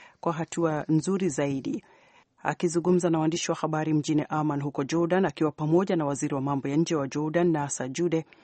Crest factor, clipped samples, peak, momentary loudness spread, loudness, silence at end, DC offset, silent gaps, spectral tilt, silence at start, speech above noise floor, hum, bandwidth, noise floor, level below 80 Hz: 18 dB; under 0.1%; -8 dBFS; 6 LU; -27 LUFS; 0.2 s; under 0.1%; none; -6 dB/octave; 0 s; 33 dB; none; 8.8 kHz; -59 dBFS; -66 dBFS